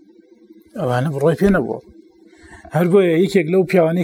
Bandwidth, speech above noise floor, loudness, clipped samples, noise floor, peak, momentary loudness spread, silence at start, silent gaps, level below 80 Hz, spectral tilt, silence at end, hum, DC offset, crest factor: 16.5 kHz; 33 dB; -17 LUFS; under 0.1%; -48 dBFS; -2 dBFS; 12 LU; 0.75 s; none; -44 dBFS; -7.5 dB/octave; 0 s; none; under 0.1%; 16 dB